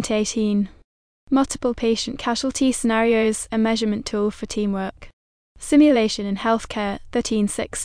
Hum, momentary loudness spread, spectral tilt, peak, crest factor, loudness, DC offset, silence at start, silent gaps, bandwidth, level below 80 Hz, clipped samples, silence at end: none; 9 LU; -4.5 dB/octave; -6 dBFS; 16 dB; -21 LUFS; under 0.1%; 0 s; 0.84-1.27 s, 5.13-5.55 s; 10.5 kHz; -46 dBFS; under 0.1%; 0 s